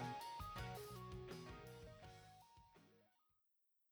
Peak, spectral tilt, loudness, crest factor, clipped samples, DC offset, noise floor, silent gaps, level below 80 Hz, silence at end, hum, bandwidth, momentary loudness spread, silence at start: -36 dBFS; -5 dB/octave; -54 LUFS; 18 dB; under 0.1%; under 0.1%; -84 dBFS; none; -66 dBFS; 0.85 s; none; over 20 kHz; 17 LU; 0 s